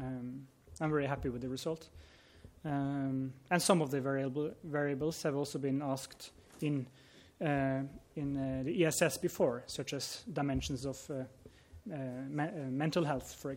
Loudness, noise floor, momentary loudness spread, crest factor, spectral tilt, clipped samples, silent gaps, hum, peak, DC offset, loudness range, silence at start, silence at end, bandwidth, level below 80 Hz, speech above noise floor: -36 LUFS; -57 dBFS; 13 LU; 22 dB; -5 dB/octave; under 0.1%; none; none; -14 dBFS; under 0.1%; 4 LU; 0 s; 0 s; 16.5 kHz; -60 dBFS; 21 dB